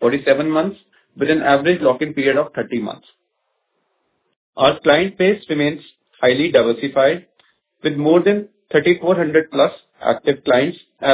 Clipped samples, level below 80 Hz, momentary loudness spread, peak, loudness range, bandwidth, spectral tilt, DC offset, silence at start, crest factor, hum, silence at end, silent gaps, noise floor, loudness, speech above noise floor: under 0.1%; -56 dBFS; 9 LU; 0 dBFS; 3 LU; 4 kHz; -9.5 dB/octave; under 0.1%; 0 s; 18 dB; none; 0 s; 4.36-4.53 s; -71 dBFS; -17 LUFS; 55 dB